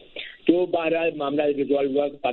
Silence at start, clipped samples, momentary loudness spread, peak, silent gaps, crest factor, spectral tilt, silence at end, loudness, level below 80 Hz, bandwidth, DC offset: 0.15 s; under 0.1%; 3 LU; -4 dBFS; none; 18 dB; -9.5 dB/octave; 0 s; -23 LUFS; -62 dBFS; 4.3 kHz; under 0.1%